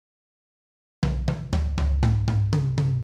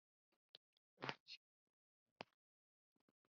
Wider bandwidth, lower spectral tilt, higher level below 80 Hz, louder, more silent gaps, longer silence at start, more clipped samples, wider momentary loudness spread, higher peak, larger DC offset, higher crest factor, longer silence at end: first, 9.6 kHz vs 6.8 kHz; first, -7.5 dB/octave vs -1.5 dB/octave; first, -30 dBFS vs under -90 dBFS; first, -25 LUFS vs -55 LUFS; second, none vs 0.57-0.97 s, 1.20-1.26 s, 1.37-2.16 s; first, 1 s vs 0.55 s; neither; second, 5 LU vs 17 LU; first, -10 dBFS vs -24 dBFS; neither; second, 14 dB vs 36 dB; second, 0 s vs 1.15 s